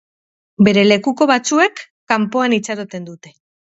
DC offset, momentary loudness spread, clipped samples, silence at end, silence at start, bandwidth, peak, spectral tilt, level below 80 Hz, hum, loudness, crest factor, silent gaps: under 0.1%; 17 LU; under 0.1%; 0.65 s; 0.6 s; 8 kHz; 0 dBFS; -4.5 dB/octave; -60 dBFS; none; -15 LUFS; 16 dB; 1.90-2.07 s